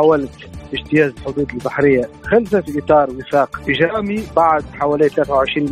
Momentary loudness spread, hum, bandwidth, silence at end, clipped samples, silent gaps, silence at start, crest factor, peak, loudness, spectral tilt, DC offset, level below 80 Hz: 7 LU; none; 14.5 kHz; 0 s; under 0.1%; none; 0 s; 14 dB; -2 dBFS; -17 LUFS; -7 dB/octave; under 0.1%; -42 dBFS